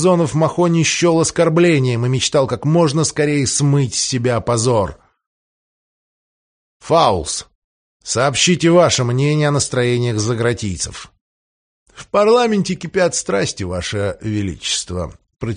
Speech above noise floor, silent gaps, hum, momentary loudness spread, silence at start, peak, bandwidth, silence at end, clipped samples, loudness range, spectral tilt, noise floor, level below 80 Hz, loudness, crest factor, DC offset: over 74 dB; 5.26-6.80 s, 7.55-8.00 s, 11.21-11.86 s; none; 10 LU; 0 s; 0 dBFS; 10 kHz; 0 s; under 0.1%; 5 LU; -4.5 dB/octave; under -90 dBFS; -44 dBFS; -16 LUFS; 16 dB; under 0.1%